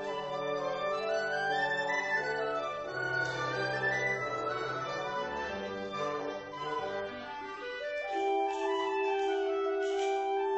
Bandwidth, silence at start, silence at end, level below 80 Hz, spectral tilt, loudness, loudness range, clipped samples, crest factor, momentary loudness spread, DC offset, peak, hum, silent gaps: 8.2 kHz; 0 s; 0 s; -68 dBFS; -4 dB/octave; -33 LUFS; 5 LU; under 0.1%; 14 dB; 7 LU; under 0.1%; -20 dBFS; none; none